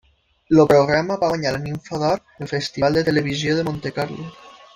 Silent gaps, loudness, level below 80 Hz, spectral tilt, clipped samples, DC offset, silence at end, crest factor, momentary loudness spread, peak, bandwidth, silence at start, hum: none; -20 LUFS; -50 dBFS; -6 dB/octave; under 0.1%; under 0.1%; 0.25 s; 18 dB; 13 LU; -2 dBFS; 15.5 kHz; 0.5 s; none